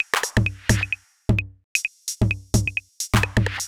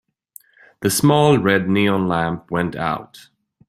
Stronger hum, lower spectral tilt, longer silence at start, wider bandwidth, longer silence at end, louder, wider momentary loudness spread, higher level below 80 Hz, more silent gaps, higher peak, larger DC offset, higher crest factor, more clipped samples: neither; second, -4 dB/octave vs -5.5 dB/octave; second, 0 s vs 0.8 s; first, 18 kHz vs 16 kHz; second, 0 s vs 0.5 s; second, -23 LUFS vs -18 LUFS; second, 6 LU vs 10 LU; first, -34 dBFS vs -52 dBFS; first, 1.64-1.75 s vs none; about the same, 0 dBFS vs -2 dBFS; neither; about the same, 22 dB vs 18 dB; neither